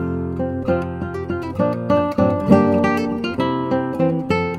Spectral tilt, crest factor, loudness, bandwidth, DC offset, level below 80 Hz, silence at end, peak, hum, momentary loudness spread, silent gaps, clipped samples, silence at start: -8 dB/octave; 18 dB; -19 LUFS; 13 kHz; under 0.1%; -44 dBFS; 0 s; -2 dBFS; none; 10 LU; none; under 0.1%; 0 s